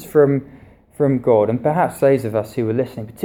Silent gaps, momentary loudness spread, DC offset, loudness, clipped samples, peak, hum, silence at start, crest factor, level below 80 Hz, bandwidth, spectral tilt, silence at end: none; 7 LU; under 0.1%; -18 LUFS; under 0.1%; -2 dBFS; none; 0 s; 16 dB; -54 dBFS; 17 kHz; -8 dB/octave; 0 s